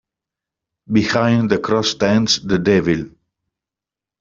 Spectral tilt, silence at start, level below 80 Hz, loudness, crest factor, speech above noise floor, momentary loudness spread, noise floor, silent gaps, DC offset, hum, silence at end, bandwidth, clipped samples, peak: -5 dB/octave; 0.9 s; -50 dBFS; -17 LUFS; 18 dB; 72 dB; 5 LU; -88 dBFS; none; under 0.1%; none; 1.15 s; 7.6 kHz; under 0.1%; 0 dBFS